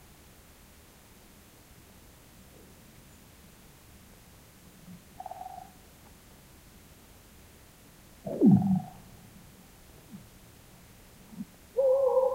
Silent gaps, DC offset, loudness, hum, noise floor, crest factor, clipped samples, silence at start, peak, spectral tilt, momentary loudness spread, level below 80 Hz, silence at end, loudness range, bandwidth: none; under 0.1%; -27 LUFS; none; -55 dBFS; 24 dB; under 0.1%; 4.9 s; -10 dBFS; -8.5 dB/octave; 29 LU; -60 dBFS; 0 s; 23 LU; 16 kHz